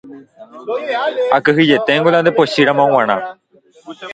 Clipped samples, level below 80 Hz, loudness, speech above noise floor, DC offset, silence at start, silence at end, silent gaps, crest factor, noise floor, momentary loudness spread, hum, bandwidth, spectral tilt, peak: under 0.1%; -60 dBFS; -14 LUFS; 28 dB; under 0.1%; 0.05 s; 0 s; none; 16 dB; -41 dBFS; 12 LU; none; 9 kHz; -6 dB/octave; 0 dBFS